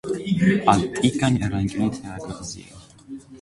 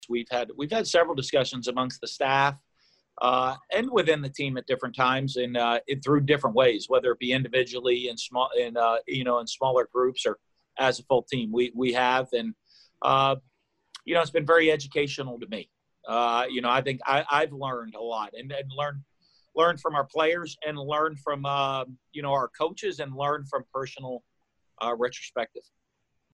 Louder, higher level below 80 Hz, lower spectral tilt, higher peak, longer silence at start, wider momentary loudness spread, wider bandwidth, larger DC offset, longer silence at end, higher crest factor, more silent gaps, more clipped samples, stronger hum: first, -22 LUFS vs -26 LUFS; first, -46 dBFS vs -66 dBFS; first, -6 dB/octave vs -4.5 dB/octave; first, -2 dBFS vs -8 dBFS; about the same, 0.05 s vs 0 s; first, 20 LU vs 11 LU; about the same, 11.5 kHz vs 10.5 kHz; neither; second, 0.05 s vs 0.75 s; about the same, 20 dB vs 20 dB; neither; neither; neither